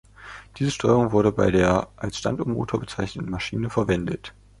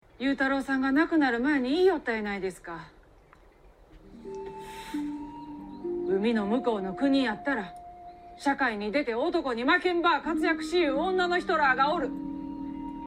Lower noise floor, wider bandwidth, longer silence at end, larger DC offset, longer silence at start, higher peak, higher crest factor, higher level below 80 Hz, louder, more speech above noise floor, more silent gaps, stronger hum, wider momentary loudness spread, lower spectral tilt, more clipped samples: second, -44 dBFS vs -56 dBFS; second, 11.5 kHz vs 13 kHz; first, 0.3 s vs 0 s; neither; about the same, 0.2 s vs 0.2 s; first, -4 dBFS vs -10 dBFS; about the same, 20 dB vs 18 dB; first, -44 dBFS vs -56 dBFS; first, -24 LUFS vs -27 LUFS; second, 21 dB vs 30 dB; neither; neither; about the same, 15 LU vs 17 LU; first, -6.5 dB/octave vs -5 dB/octave; neither